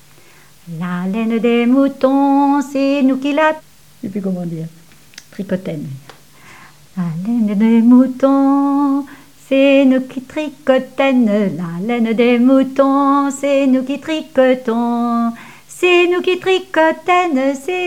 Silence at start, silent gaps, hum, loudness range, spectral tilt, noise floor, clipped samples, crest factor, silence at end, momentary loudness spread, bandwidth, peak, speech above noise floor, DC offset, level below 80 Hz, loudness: 0.65 s; none; none; 8 LU; -6 dB/octave; -46 dBFS; under 0.1%; 14 dB; 0 s; 14 LU; 14 kHz; 0 dBFS; 32 dB; 0.5%; -62 dBFS; -15 LUFS